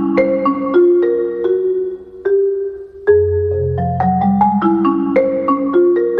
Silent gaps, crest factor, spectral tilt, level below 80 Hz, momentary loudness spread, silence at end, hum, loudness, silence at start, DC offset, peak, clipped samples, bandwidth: none; 12 dB; -11 dB/octave; -48 dBFS; 6 LU; 0 s; none; -15 LUFS; 0 s; under 0.1%; -2 dBFS; under 0.1%; 4.5 kHz